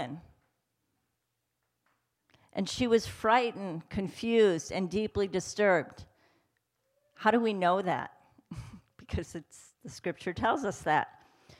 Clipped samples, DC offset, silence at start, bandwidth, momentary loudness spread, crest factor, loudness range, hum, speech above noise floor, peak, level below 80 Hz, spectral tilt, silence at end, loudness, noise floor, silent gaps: under 0.1%; under 0.1%; 0 s; 14 kHz; 19 LU; 20 dB; 5 LU; none; 53 dB; -12 dBFS; -58 dBFS; -5 dB/octave; 0.5 s; -30 LUFS; -82 dBFS; none